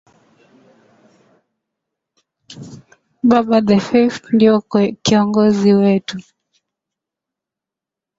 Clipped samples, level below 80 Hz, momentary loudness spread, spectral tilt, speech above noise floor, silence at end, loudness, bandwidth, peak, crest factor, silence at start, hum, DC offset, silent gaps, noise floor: under 0.1%; -56 dBFS; 18 LU; -6 dB/octave; 72 dB; 1.95 s; -14 LUFS; 7.8 kHz; 0 dBFS; 16 dB; 2.5 s; none; under 0.1%; none; -86 dBFS